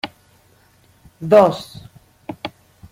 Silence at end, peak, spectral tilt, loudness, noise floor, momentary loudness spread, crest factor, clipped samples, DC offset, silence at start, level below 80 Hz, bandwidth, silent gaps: 0.45 s; -2 dBFS; -6.5 dB/octave; -14 LUFS; -54 dBFS; 24 LU; 20 dB; under 0.1%; under 0.1%; 0.05 s; -56 dBFS; 15.5 kHz; none